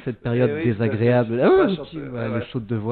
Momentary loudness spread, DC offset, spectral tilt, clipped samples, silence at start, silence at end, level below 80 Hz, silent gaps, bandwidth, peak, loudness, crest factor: 11 LU; under 0.1%; -11.5 dB/octave; under 0.1%; 0 s; 0 s; -50 dBFS; none; 4.5 kHz; -4 dBFS; -21 LUFS; 16 dB